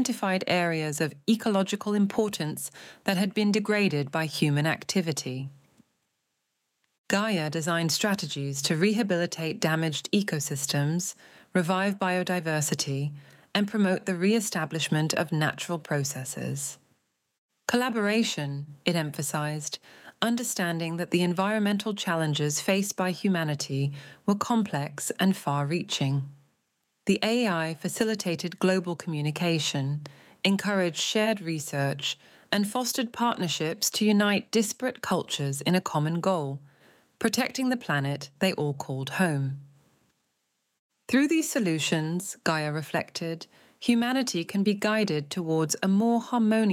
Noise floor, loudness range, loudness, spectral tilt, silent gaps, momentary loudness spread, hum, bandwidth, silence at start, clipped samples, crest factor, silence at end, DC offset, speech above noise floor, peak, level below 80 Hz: -79 dBFS; 3 LU; -27 LUFS; -4.5 dB/octave; 6.98-7.04 s, 17.38-17.49 s, 40.79-40.89 s; 8 LU; none; 16.5 kHz; 0 s; under 0.1%; 20 dB; 0 s; under 0.1%; 52 dB; -6 dBFS; -74 dBFS